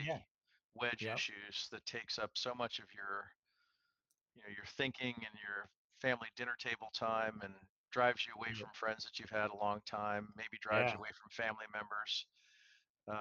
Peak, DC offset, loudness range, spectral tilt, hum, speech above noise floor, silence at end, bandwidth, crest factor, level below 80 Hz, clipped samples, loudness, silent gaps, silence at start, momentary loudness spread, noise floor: -18 dBFS; under 0.1%; 5 LU; -3.5 dB/octave; none; 44 dB; 0 s; 7.8 kHz; 24 dB; -78 dBFS; under 0.1%; -41 LUFS; 0.31-0.39 s, 0.64-0.70 s, 3.36-3.43 s, 4.21-4.26 s, 5.76-5.90 s, 7.69-7.84 s, 12.90-12.95 s; 0 s; 12 LU; -86 dBFS